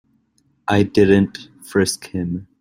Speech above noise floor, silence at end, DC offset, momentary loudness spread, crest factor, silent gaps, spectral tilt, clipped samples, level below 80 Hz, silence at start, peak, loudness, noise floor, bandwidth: 45 dB; 0.15 s; under 0.1%; 13 LU; 18 dB; none; -5.5 dB/octave; under 0.1%; -50 dBFS; 0.7 s; -2 dBFS; -18 LUFS; -63 dBFS; 16 kHz